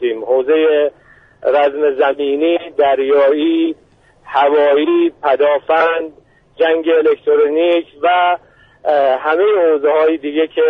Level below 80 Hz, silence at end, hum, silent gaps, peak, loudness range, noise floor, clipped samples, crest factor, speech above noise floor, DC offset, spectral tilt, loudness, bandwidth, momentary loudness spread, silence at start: -60 dBFS; 0 s; none; none; -2 dBFS; 1 LU; -41 dBFS; under 0.1%; 12 dB; 28 dB; under 0.1%; -6 dB/octave; -14 LUFS; 4.6 kHz; 5 LU; 0 s